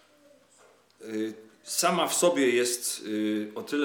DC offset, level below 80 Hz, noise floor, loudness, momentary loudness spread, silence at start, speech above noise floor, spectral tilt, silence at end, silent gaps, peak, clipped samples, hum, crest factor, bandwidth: under 0.1%; under -90 dBFS; -60 dBFS; -27 LUFS; 13 LU; 1 s; 33 dB; -2.5 dB/octave; 0 s; none; -10 dBFS; under 0.1%; none; 18 dB; 19 kHz